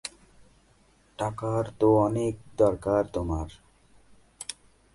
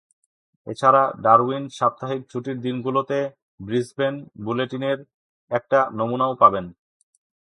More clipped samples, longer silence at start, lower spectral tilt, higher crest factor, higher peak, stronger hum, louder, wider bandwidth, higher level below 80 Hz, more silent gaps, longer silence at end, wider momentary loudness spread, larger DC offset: neither; second, 0.05 s vs 0.65 s; about the same, -7 dB/octave vs -6.5 dB/octave; about the same, 20 dB vs 22 dB; second, -10 dBFS vs 0 dBFS; neither; second, -27 LUFS vs -22 LUFS; about the same, 11.5 kHz vs 11.5 kHz; first, -46 dBFS vs -62 dBFS; second, none vs 3.42-3.58 s, 5.14-5.48 s; second, 0.4 s vs 0.7 s; first, 17 LU vs 14 LU; neither